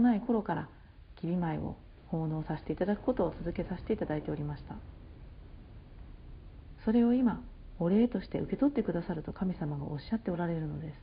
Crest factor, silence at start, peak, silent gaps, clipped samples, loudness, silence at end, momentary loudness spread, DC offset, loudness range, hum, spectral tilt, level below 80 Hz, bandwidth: 16 dB; 0 s; -16 dBFS; none; under 0.1%; -33 LUFS; 0 s; 24 LU; under 0.1%; 7 LU; none; -8 dB/octave; -50 dBFS; 5.2 kHz